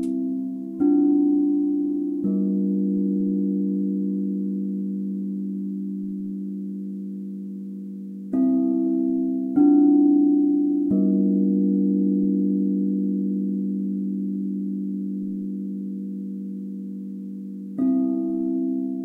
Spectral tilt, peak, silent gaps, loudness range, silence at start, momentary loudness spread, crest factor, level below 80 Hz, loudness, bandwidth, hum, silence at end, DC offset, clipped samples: -12.5 dB/octave; -8 dBFS; none; 10 LU; 0 s; 14 LU; 14 dB; -70 dBFS; -23 LUFS; 1.5 kHz; none; 0 s; under 0.1%; under 0.1%